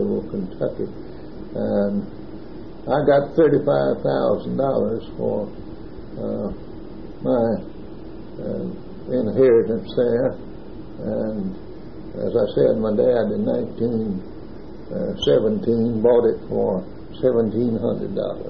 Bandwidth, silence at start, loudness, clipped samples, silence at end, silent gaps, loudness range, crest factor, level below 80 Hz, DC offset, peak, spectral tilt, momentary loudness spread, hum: 6.8 kHz; 0 s; -21 LUFS; under 0.1%; 0 s; none; 6 LU; 16 dB; -46 dBFS; 1%; -4 dBFS; -8.5 dB/octave; 20 LU; none